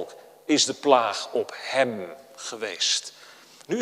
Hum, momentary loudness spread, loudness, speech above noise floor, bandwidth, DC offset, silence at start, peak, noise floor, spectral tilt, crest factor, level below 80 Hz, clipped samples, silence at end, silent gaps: none; 19 LU; -24 LUFS; 24 dB; 15.5 kHz; under 0.1%; 0 s; -2 dBFS; -48 dBFS; -2 dB/octave; 24 dB; -78 dBFS; under 0.1%; 0 s; none